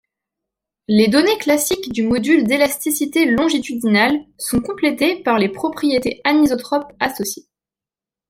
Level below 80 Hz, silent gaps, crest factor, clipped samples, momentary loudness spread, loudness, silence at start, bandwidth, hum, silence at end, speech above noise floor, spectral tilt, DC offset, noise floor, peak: -52 dBFS; none; 16 dB; under 0.1%; 7 LU; -17 LUFS; 0.9 s; 16.5 kHz; none; 0.9 s; 73 dB; -4 dB/octave; under 0.1%; -90 dBFS; -2 dBFS